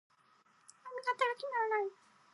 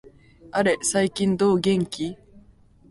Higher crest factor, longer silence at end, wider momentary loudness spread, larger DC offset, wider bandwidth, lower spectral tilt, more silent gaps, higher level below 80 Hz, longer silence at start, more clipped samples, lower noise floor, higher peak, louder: about the same, 20 dB vs 16 dB; second, 0.4 s vs 0.75 s; about the same, 12 LU vs 10 LU; neither; about the same, 11.5 kHz vs 11.5 kHz; second, -1.5 dB/octave vs -4.5 dB/octave; neither; second, under -90 dBFS vs -56 dBFS; first, 0.85 s vs 0.55 s; neither; first, -69 dBFS vs -53 dBFS; second, -18 dBFS vs -8 dBFS; second, -36 LUFS vs -23 LUFS